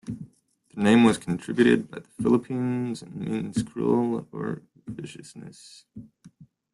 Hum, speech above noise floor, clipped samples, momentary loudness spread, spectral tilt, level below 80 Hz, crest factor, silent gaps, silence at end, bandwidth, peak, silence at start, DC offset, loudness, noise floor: none; 35 dB; under 0.1%; 22 LU; -6.5 dB/octave; -60 dBFS; 20 dB; none; 0.3 s; 11.5 kHz; -6 dBFS; 0.05 s; under 0.1%; -25 LUFS; -60 dBFS